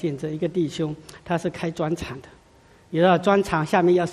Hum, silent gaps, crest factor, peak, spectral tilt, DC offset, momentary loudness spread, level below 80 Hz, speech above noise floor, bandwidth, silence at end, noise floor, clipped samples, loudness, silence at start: none; none; 18 dB; -6 dBFS; -6.5 dB/octave; under 0.1%; 12 LU; -52 dBFS; 31 dB; 13 kHz; 0 s; -54 dBFS; under 0.1%; -23 LUFS; 0 s